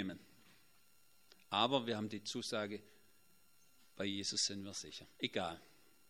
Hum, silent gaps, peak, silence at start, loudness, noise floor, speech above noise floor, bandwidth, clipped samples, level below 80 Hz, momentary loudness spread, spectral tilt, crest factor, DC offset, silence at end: none; none; -18 dBFS; 0 s; -40 LUFS; -72 dBFS; 31 dB; 16 kHz; under 0.1%; -80 dBFS; 14 LU; -3 dB/octave; 26 dB; under 0.1%; 0.45 s